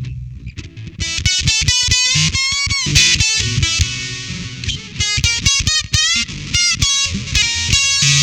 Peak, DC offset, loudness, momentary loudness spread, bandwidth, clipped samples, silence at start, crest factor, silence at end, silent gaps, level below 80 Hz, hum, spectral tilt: 0 dBFS; 0.2%; -14 LUFS; 14 LU; 18 kHz; under 0.1%; 0 s; 16 dB; 0 s; none; -28 dBFS; none; -1 dB/octave